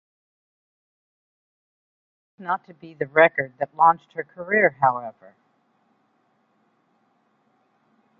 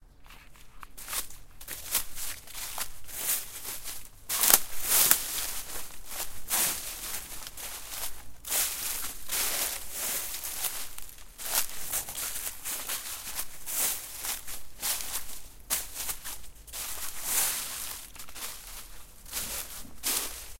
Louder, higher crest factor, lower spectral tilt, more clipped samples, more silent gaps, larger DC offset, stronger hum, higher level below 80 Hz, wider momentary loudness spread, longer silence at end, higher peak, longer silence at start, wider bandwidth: first, -21 LUFS vs -30 LUFS; second, 24 dB vs 32 dB; first, -8 dB/octave vs 0.5 dB/octave; neither; neither; neither; neither; second, -72 dBFS vs -52 dBFS; about the same, 17 LU vs 16 LU; first, 3.1 s vs 0 s; about the same, -2 dBFS vs 0 dBFS; first, 2.4 s vs 0 s; second, 4.5 kHz vs 17 kHz